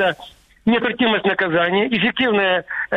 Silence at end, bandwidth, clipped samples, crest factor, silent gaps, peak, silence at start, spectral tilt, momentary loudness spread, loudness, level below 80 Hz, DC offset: 0 s; 6.6 kHz; under 0.1%; 12 dB; none; -6 dBFS; 0 s; -6.5 dB/octave; 4 LU; -18 LUFS; -54 dBFS; under 0.1%